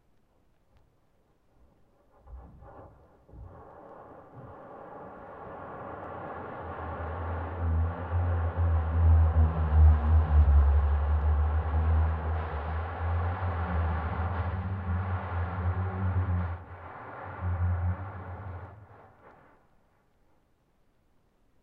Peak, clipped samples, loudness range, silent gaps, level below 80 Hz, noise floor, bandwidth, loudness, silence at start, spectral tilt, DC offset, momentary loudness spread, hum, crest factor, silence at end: -12 dBFS; under 0.1%; 21 LU; none; -32 dBFS; -68 dBFS; 3.6 kHz; -29 LUFS; 2.25 s; -11 dB/octave; under 0.1%; 24 LU; none; 18 dB; 2.8 s